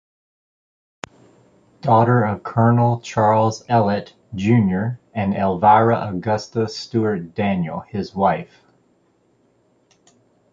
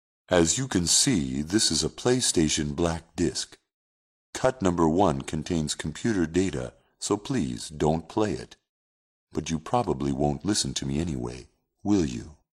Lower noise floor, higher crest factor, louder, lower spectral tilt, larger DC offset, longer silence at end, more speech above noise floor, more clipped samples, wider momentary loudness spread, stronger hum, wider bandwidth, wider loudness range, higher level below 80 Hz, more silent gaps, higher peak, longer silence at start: second, -61 dBFS vs under -90 dBFS; about the same, 18 dB vs 20 dB; first, -19 LUFS vs -26 LUFS; first, -7.5 dB/octave vs -4 dB/octave; neither; first, 2.1 s vs 0.25 s; second, 43 dB vs over 64 dB; neither; about the same, 13 LU vs 12 LU; neither; second, 7.6 kHz vs 15 kHz; about the same, 6 LU vs 5 LU; about the same, -50 dBFS vs -46 dBFS; second, none vs 3.74-4.33 s, 8.69-9.27 s; first, -2 dBFS vs -6 dBFS; first, 1.85 s vs 0.3 s